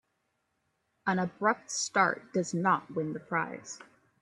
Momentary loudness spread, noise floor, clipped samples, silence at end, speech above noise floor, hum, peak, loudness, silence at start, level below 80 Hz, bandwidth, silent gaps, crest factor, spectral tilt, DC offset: 11 LU; -79 dBFS; under 0.1%; 0.4 s; 48 dB; none; -10 dBFS; -30 LUFS; 1.05 s; -76 dBFS; 11 kHz; none; 22 dB; -4 dB/octave; under 0.1%